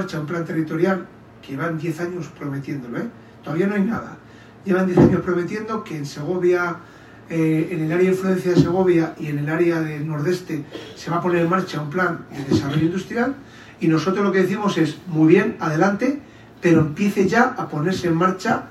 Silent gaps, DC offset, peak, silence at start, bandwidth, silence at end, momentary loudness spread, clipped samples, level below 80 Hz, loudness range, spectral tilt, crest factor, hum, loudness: none; under 0.1%; 0 dBFS; 0 s; 13 kHz; 0 s; 12 LU; under 0.1%; -54 dBFS; 7 LU; -7 dB/octave; 20 dB; none; -21 LUFS